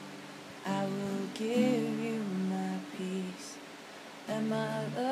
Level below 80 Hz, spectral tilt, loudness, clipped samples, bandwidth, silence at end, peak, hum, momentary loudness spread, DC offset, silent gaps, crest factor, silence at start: -84 dBFS; -6 dB/octave; -34 LUFS; under 0.1%; 15.5 kHz; 0 s; -18 dBFS; none; 16 LU; under 0.1%; none; 18 dB; 0 s